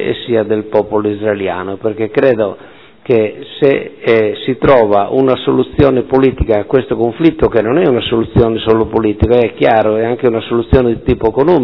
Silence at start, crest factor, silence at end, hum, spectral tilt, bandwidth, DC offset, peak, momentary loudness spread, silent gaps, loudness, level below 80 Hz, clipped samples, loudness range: 0 s; 12 dB; 0 s; none; -9.5 dB/octave; 5.4 kHz; 0.4%; 0 dBFS; 5 LU; none; -13 LUFS; -30 dBFS; 0.7%; 3 LU